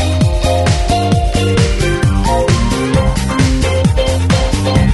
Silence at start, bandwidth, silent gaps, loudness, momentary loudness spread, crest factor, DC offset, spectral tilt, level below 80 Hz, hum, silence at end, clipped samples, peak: 0 s; 12 kHz; none; -13 LUFS; 1 LU; 10 dB; under 0.1%; -5.5 dB/octave; -18 dBFS; none; 0 s; under 0.1%; 0 dBFS